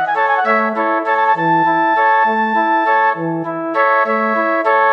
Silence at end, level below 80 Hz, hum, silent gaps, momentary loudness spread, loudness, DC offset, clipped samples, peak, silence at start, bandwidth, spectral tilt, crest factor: 0 s; -74 dBFS; none; none; 4 LU; -14 LUFS; under 0.1%; under 0.1%; -2 dBFS; 0 s; 6.4 kHz; -7 dB/octave; 12 dB